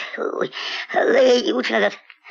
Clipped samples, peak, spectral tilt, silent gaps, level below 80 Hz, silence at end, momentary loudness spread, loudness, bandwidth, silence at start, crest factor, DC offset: under 0.1%; -6 dBFS; -3.5 dB/octave; none; -72 dBFS; 0 s; 11 LU; -19 LUFS; 7.6 kHz; 0 s; 14 dB; under 0.1%